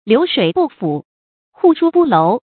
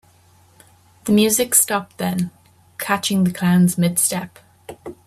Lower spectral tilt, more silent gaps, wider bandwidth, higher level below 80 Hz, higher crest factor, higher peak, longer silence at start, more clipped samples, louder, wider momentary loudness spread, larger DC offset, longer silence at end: first, -11.5 dB/octave vs -4 dB/octave; first, 1.05-1.52 s vs none; second, 4.5 kHz vs 16 kHz; about the same, -60 dBFS vs -58 dBFS; second, 14 dB vs 20 dB; about the same, 0 dBFS vs 0 dBFS; second, 0.05 s vs 1.05 s; neither; first, -14 LUFS vs -18 LUFS; second, 10 LU vs 19 LU; neither; about the same, 0.2 s vs 0.15 s